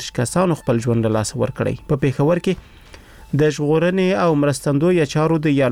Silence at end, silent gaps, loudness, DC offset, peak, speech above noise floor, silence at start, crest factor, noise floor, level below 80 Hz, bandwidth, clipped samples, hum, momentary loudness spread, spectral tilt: 0 s; none; -18 LUFS; under 0.1%; -6 dBFS; 24 dB; 0 s; 12 dB; -42 dBFS; -44 dBFS; 16 kHz; under 0.1%; none; 5 LU; -6.5 dB/octave